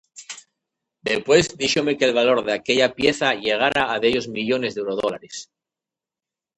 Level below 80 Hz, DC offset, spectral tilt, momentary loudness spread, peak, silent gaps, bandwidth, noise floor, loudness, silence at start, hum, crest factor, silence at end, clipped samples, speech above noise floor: -56 dBFS; under 0.1%; -3.5 dB/octave; 18 LU; -2 dBFS; none; 11 kHz; -89 dBFS; -20 LUFS; 0.15 s; none; 20 dB; 1.15 s; under 0.1%; 69 dB